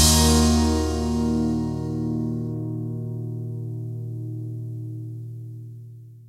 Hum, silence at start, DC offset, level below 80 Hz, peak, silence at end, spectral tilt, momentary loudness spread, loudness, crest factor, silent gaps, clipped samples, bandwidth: none; 0 s; under 0.1%; -32 dBFS; -4 dBFS; 0 s; -4.5 dB/octave; 19 LU; -24 LUFS; 20 dB; none; under 0.1%; 16 kHz